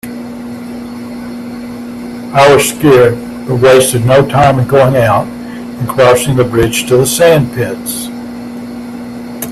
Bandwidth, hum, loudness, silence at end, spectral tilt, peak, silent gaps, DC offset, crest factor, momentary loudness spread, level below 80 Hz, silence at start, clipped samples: 15.5 kHz; 60 Hz at -25 dBFS; -9 LUFS; 0 s; -5 dB/octave; 0 dBFS; none; under 0.1%; 10 dB; 17 LU; -38 dBFS; 0.05 s; under 0.1%